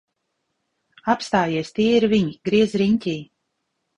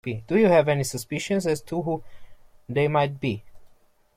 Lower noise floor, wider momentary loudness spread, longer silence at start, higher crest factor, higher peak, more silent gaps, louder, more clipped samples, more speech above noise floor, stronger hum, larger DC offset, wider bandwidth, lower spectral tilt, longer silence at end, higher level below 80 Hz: first, -75 dBFS vs -57 dBFS; second, 9 LU vs 12 LU; first, 1.05 s vs 0.05 s; about the same, 18 dB vs 18 dB; first, -4 dBFS vs -8 dBFS; neither; first, -20 LUFS vs -24 LUFS; neither; first, 56 dB vs 33 dB; neither; neither; second, 10 kHz vs 16.5 kHz; about the same, -6 dB/octave vs -6 dB/octave; first, 0.75 s vs 0.5 s; about the same, -56 dBFS vs -56 dBFS